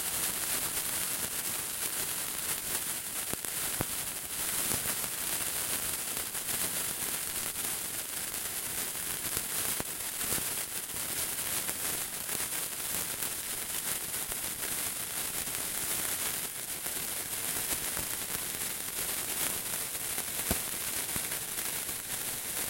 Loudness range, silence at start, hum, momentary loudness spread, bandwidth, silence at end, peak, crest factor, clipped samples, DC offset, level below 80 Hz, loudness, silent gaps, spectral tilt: 1 LU; 0 s; none; 3 LU; 17 kHz; 0 s; -6 dBFS; 28 dB; under 0.1%; under 0.1%; -58 dBFS; -32 LUFS; none; -0.5 dB/octave